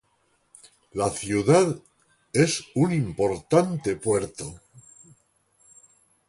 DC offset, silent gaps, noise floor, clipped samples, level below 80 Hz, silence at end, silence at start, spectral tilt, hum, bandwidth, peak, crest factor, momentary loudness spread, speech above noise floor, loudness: under 0.1%; none; -68 dBFS; under 0.1%; -54 dBFS; 1.5 s; 0.95 s; -5.5 dB/octave; none; 11.5 kHz; -6 dBFS; 20 dB; 15 LU; 45 dB; -24 LUFS